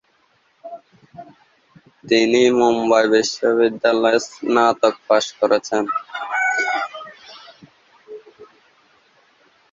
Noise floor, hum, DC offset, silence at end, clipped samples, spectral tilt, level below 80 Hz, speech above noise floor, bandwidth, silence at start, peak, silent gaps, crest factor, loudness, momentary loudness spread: -61 dBFS; none; under 0.1%; 1.3 s; under 0.1%; -3.5 dB/octave; -66 dBFS; 44 dB; 7.8 kHz; 0.65 s; -2 dBFS; none; 18 dB; -18 LUFS; 23 LU